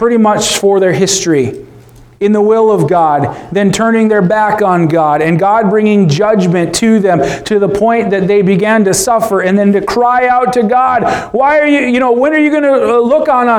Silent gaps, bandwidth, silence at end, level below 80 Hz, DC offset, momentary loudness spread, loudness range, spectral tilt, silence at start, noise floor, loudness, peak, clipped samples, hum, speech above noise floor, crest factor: none; 17 kHz; 0 s; -44 dBFS; under 0.1%; 3 LU; 1 LU; -5 dB/octave; 0 s; -37 dBFS; -10 LUFS; 0 dBFS; under 0.1%; none; 28 dB; 10 dB